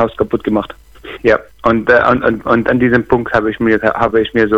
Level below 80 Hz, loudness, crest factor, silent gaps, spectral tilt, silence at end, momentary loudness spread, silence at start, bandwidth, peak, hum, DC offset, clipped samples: -38 dBFS; -13 LUFS; 12 dB; none; -7.5 dB/octave; 0 s; 7 LU; 0 s; 7.8 kHz; 0 dBFS; none; under 0.1%; under 0.1%